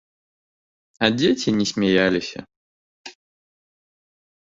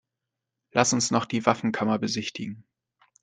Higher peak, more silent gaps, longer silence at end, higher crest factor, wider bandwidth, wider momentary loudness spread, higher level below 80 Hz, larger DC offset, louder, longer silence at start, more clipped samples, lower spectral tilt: about the same, -4 dBFS vs -4 dBFS; first, 2.56-3.04 s vs none; first, 1.3 s vs 0.6 s; about the same, 22 dB vs 24 dB; second, 7.8 kHz vs 9.6 kHz; first, 23 LU vs 14 LU; first, -56 dBFS vs -66 dBFS; neither; first, -20 LUFS vs -25 LUFS; first, 1 s vs 0.75 s; neither; about the same, -4.5 dB/octave vs -4 dB/octave